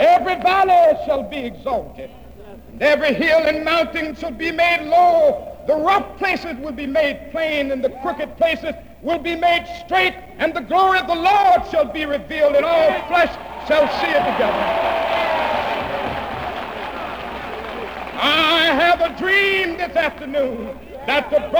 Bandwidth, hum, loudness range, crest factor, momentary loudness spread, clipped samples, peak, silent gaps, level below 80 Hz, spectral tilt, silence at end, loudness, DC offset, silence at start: over 20 kHz; none; 4 LU; 12 dB; 14 LU; under 0.1%; -6 dBFS; none; -44 dBFS; -4.5 dB/octave; 0 s; -18 LUFS; 0.3%; 0 s